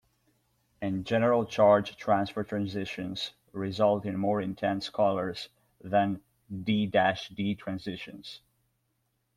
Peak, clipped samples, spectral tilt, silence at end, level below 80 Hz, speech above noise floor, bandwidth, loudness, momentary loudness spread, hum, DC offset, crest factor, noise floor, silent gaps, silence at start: -10 dBFS; under 0.1%; -6.5 dB/octave; 1 s; -66 dBFS; 48 dB; 13 kHz; -29 LUFS; 16 LU; none; under 0.1%; 20 dB; -76 dBFS; none; 0.8 s